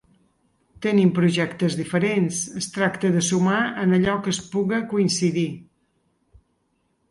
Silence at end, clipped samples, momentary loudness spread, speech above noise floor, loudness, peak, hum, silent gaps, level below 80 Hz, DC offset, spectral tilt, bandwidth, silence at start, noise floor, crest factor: 1.45 s; under 0.1%; 7 LU; 48 dB; -22 LUFS; -6 dBFS; none; none; -58 dBFS; under 0.1%; -5 dB/octave; 11.5 kHz; 0.8 s; -69 dBFS; 16 dB